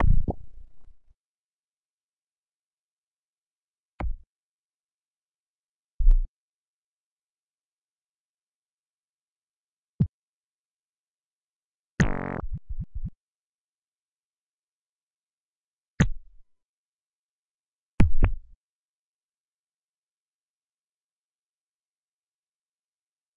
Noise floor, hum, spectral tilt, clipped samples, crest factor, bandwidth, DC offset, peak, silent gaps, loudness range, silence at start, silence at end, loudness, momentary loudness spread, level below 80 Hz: under -90 dBFS; none; -7 dB/octave; under 0.1%; 26 dB; 7.4 kHz; under 0.1%; -4 dBFS; 1.16-3.99 s, 4.27-5.99 s, 6.28-9.99 s, 10.09-11.98 s, 13.15-15.98 s, 16.65-17.98 s; 13 LU; 0 s; 4.95 s; -29 LUFS; 16 LU; -32 dBFS